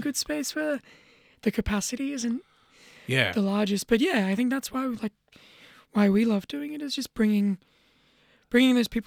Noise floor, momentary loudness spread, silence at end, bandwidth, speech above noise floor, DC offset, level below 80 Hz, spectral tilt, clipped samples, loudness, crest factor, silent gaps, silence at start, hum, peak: -63 dBFS; 12 LU; 0.05 s; 18 kHz; 38 dB; under 0.1%; -52 dBFS; -4.5 dB/octave; under 0.1%; -26 LUFS; 20 dB; none; 0 s; none; -6 dBFS